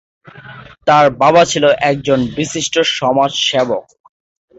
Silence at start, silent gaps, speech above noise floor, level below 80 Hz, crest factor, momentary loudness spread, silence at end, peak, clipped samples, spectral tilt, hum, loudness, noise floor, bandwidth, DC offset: 0.25 s; none; 23 dB; -50 dBFS; 14 dB; 9 LU; 0.75 s; 0 dBFS; under 0.1%; -3.5 dB/octave; none; -13 LUFS; -36 dBFS; 8.2 kHz; under 0.1%